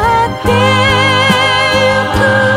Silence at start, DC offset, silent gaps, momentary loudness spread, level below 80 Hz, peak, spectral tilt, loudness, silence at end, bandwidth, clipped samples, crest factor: 0 s; under 0.1%; none; 3 LU; -30 dBFS; 0 dBFS; -4.5 dB/octave; -10 LUFS; 0 s; 16 kHz; under 0.1%; 10 dB